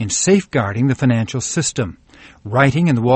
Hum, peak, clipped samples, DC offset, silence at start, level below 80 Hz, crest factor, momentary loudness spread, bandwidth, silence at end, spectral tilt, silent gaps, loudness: none; 0 dBFS; under 0.1%; under 0.1%; 0 s; -46 dBFS; 16 dB; 9 LU; 8.8 kHz; 0 s; -5 dB/octave; none; -17 LUFS